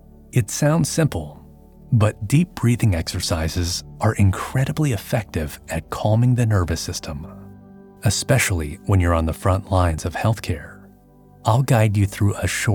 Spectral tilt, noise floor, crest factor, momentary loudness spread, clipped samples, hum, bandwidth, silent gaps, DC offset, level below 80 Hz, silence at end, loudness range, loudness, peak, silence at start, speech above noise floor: -5.5 dB/octave; -49 dBFS; 18 dB; 10 LU; under 0.1%; none; 18.5 kHz; none; under 0.1%; -36 dBFS; 0 s; 2 LU; -21 LUFS; -4 dBFS; 0.35 s; 29 dB